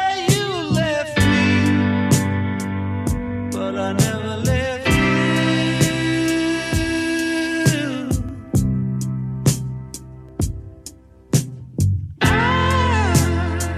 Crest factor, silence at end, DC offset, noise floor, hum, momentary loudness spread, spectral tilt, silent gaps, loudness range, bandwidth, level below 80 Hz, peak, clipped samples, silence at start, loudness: 18 dB; 0 s; under 0.1%; -41 dBFS; none; 9 LU; -5 dB/octave; none; 5 LU; 15 kHz; -34 dBFS; -2 dBFS; under 0.1%; 0 s; -19 LUFS